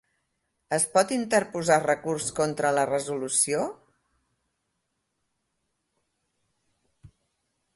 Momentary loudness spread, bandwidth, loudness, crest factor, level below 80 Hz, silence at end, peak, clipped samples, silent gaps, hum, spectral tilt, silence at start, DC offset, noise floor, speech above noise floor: 6 LU; 12 kHz; -25 LUFS; 22 dB; -66 dBFS; 0.7 s; -6 dBFS; under 0.1%; none; none; -3.5 dB/octave; 0.7 s; under 0.1%; -78 dBFS; 53 dB